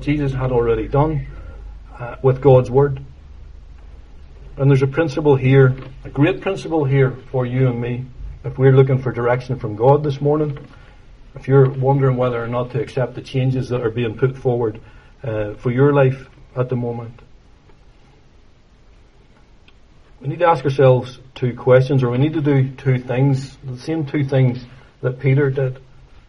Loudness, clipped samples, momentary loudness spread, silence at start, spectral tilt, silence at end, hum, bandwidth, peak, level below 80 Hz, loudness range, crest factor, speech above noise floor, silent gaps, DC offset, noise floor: -18 LUFS; under 0.1%; 17 LU; 0 s; -9 dB/octave; 0.5 s; none; 6.6 kHz; 0 dBFS; -40 dBFS; 5 LU; 18 dB; 31 dB; none; under 0.1%; -48 dBFS